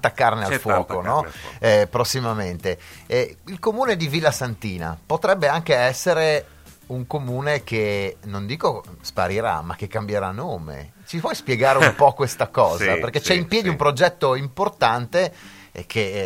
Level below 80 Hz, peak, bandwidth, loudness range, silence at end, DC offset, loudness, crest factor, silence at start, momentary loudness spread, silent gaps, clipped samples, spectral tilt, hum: -52 dBFS; 0 dBFS; 16.5 kHz; 6 LU; 0 s; under 0.1%; -21 LUFS; 22 dB; 0 s; 11 LU; none; under 0.1%; -4.5 dB/octave; none